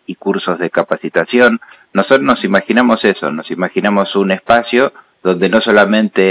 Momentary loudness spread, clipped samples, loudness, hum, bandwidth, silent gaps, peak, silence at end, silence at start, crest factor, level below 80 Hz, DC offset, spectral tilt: 9 LU; under 0.1%; -13 LUFS; none; 4 kHz; none; 0 dBFS; 0 s; 0.1 s; 12 dB; -54 dBFS; under 0.1%; -9.5 dB/octave